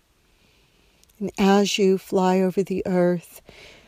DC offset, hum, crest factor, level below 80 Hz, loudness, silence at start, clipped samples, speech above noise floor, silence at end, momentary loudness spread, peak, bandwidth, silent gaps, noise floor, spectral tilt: under 0.1%; none; 16 dB; -58 dBFS; -21 LUFS; 1.2 s; under 0.1%; 40 dB; 0.65 s; 11 LU; -8 dBFS; 15.5 kHz; none; -61 dBFS; -5.5 dB/octave